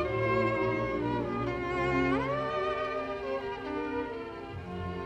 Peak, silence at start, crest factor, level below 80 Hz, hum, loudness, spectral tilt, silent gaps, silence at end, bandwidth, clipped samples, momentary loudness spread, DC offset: -16 dBFS; 0 s; 14 dB; -50 dBFS; none; -32 LUFS; -7.5 dB/octave; none; 0 s; 8.8 kHz; under 0.1%; 10 LU; under 0.1%